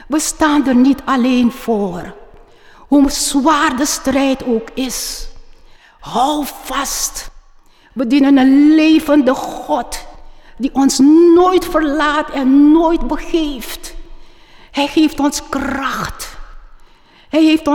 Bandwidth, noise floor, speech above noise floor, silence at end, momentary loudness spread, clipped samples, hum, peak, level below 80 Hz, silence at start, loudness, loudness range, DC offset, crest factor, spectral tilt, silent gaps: 18 kHz; -45 dBFS; 32 dB; 0 s; 15 LU; under 0.1%; none; -4 dBFS; -34 dBFS; 0.05 s; -14 LUFS; 8 LU; under 0.1%; 12 dB; -3.5 dB/octave; none